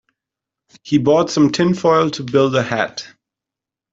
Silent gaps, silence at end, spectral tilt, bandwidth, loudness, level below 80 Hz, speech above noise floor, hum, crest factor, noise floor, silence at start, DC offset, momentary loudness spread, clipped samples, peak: none; 0.85 s; -5.5 dB/octave; 7.8 kHz; -16 LUFS; -56 dBFS; 71 dB; none; 16 dB; -86 dBFS; 0.85 s; under 0.1%; 7 LU; under 0.1%; -2 dBFS